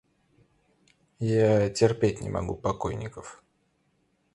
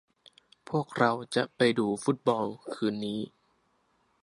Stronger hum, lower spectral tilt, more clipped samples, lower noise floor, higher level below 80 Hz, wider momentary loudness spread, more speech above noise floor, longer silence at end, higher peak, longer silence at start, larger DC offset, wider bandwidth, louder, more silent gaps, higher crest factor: neither; about the same, -6.5 dB/octave vs -5.5 dB/octave; neither; about the same, -71 dBFS vs -71 dBFS; first, -50 dBFS vs -72 dBFS; first, 16 LU vs 9 LU; about the same, 45 dB vs 42 dB; about the same, 1 s vs 0.95 s; about the same, -8 dBFS vs -8 dBFS; first, 1.2 s vs 0.7 s; neither; about the same, 11.5 kHz vs 11.5 kHz; first, -26 LUFS vs -29 LUFS; neither; about the same, 22 dB vs 24 dB